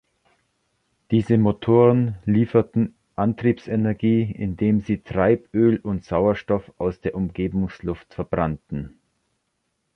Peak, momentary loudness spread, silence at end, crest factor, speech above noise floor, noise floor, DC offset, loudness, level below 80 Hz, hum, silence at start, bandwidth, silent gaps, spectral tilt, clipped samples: -4 dBFS; 9 LU; 1.05 s; 18 dB; 53 dB; -74 dBFS; under 0.1%; -22 LUFS; -46 dBFS; none; 1.1 s; 6.2 kHz; none; -10 dB/octave; under 0.1%